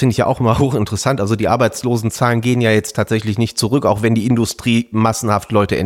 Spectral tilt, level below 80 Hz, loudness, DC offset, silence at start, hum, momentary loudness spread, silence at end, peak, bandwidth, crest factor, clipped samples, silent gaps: -5.5 dB/octave; -42 dBFS; -16 LUFS; under 0.1%; 0 s; none; 3 LU; 0 s; -2 dBFS; 16.5 kHz; 14 dB; under 0.1%; none